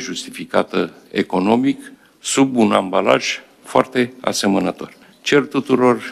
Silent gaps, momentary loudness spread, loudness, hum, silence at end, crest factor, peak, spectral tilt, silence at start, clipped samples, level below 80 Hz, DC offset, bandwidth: none; 11 LU; -18 LUFS; none; 0 s; 18 dB; 0 dBFS; -4.5 dB/octave; 0 s; under 0.1%; -62 dBFS; under 0.1%; 14.5 kHz